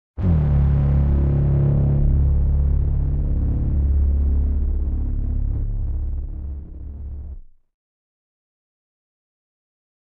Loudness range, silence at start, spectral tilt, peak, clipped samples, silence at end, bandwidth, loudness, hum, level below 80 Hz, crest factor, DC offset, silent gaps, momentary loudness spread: 19 LU; 0.15 s; -12.5 dB/octave; -8 dBFS; under 0.1%; 2.75 s; 2.5 kHz; -21 LUFS; none; -22 dBFS; 12 dB; under 0.1%; none; 16 LU